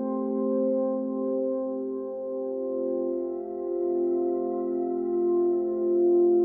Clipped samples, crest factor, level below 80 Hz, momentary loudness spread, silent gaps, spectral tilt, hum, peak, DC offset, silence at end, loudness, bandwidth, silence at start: under 0.1%; 12 dB; -70 dBFS; 8 LU; none; -13 dB/octave; none; -14 dBFS; under 0.1%; 0 s; -27 LUFS; 2 kHz; 0 s